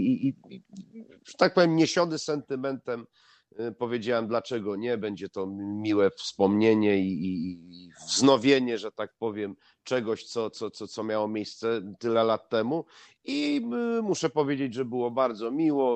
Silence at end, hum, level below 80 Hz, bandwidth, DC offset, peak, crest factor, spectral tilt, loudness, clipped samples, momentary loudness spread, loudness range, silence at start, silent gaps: 0 s; none; -74 dBFS; 9 kHz; under 0.1%; -6 dBFS; 22 dB; -5 dB/octave; -27 LUFS; under 0.1%; 15 LU; 6 LU; 0 s; none